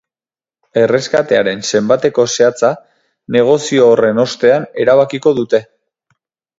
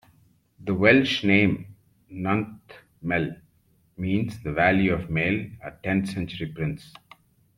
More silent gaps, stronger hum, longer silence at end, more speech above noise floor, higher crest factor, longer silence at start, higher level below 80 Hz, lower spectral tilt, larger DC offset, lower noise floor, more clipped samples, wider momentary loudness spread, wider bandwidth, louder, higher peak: neither; neither; first, 0.95 s vs 0.75 s; first, over 78 dB vs 40 dB; second, 14 dB vs 22 dB; first, 0.75 s vs 0.6 s; second, -58 dBFS vs -52 dBFS; second, -4.5 dB/octave vs -7 dB/octave; neither; first, under -90 dBFS vs -64 dBFS; neither; second, 6 LU vs 15 LU; second, 7.8 kHz vs 12 kHz; first, -13 LUFS vs -24 LUFS; about the same, 0 dBFS vs -2 dBFS